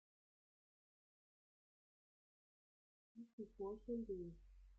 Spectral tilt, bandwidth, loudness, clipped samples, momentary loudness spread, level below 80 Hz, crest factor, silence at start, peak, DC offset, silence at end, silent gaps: -10.5 dB/octave; 7.4 kHz; -51 LUFS; under 0.1%; 17 LU; -70 dBFS; 20 dB; 3.15 s; -36 dBFS; under 0.1%; 0 s; 3.33-3.38 s